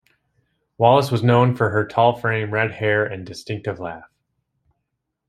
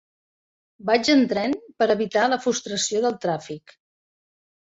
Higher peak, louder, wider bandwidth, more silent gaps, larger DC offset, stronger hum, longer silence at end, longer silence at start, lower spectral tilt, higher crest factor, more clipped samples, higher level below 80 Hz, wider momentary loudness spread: first, 0 dBFS vs -6 dBFS; first, -19 LUFS vs -22 LUFS; first, 13.5 kHz vs 8 kHz; neither; neither; neither; first, 1.3 s vs 1.1 s; about the same, 0.8 s vs 0.85 s; first, -7 dB/octave vs -3.5 dB/octave; about the same, 20 dB vs 18 dB; neither; first, -60 dBFS vs -66 dBFS; first, 15 LU vs 12 LU